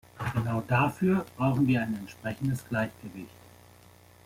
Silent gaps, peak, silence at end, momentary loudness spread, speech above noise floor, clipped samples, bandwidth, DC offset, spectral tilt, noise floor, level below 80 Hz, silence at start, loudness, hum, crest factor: none; -12 dBFS; 0.95 s; 17 LU; 27 dB; under 0.1%; 16 kHz; under 0.1%; -7.5 dB/octave; -55 dBFS; -58 dBFS; 0.15 s; -29 LUFS; 60 Hz at -50 dBFS; 16 dB